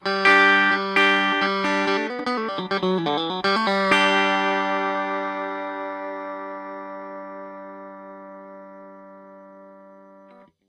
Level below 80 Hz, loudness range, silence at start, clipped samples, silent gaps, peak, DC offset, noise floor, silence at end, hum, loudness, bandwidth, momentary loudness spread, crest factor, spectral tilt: -68 dBFS; 19 LU; 0 s; under 0.1%; none; -4 dBFS; under 0.1%; -51 dBFS; 0.7 s; none; -20 LUFS; 12 kHz; 23 LU; 20 dB; -4 dB/octave